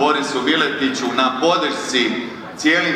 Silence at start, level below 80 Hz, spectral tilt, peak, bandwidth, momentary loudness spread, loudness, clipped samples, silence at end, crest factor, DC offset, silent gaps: 0 s; -62 dBFS; -3 dB/octave; -2 dBFS; 14.5 kHz; 4 LU; -18 LUFS; under 0.1%; 0 s; 16 dB; under 0.1%; none